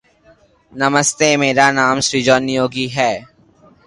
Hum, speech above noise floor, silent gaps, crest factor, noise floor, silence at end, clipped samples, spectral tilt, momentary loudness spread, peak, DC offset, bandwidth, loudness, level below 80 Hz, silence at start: none; 36 dB; none; 16 dB; -51 dBFS; 0.65 s; under 0.1%; -3 dB/octave; 7 LU; 0 dBFS; under 0.1%; 11.5 kHz; -15 LUFS; -52 dBFS; 0.75 s